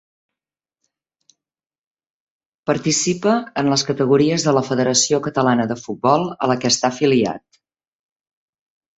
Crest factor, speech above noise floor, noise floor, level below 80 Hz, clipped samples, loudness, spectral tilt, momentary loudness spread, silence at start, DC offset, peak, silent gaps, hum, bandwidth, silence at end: 18 dB; over 72 dB; under -90 dBFS; -60 dBFS; under 0.1%; -18 LUFS; -4 dB/octave; 6 LU; 2.65 s; under 0.1%; -2 dBFS; none; none; 8.2 kHz; 1.6 s